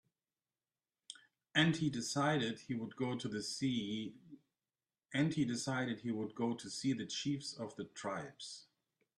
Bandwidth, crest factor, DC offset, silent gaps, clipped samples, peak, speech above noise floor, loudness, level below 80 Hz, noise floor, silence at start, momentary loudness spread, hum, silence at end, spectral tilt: 12.5 kHz; 22 dB; under 0.1%; none; under 0.1%; -18 dBFS; over 52 dB; -38 LUFS; -76 dBFS; under -90 dBFS; 1.1 s; 15 LU; none; 0.55 s; -4.5 dB/octave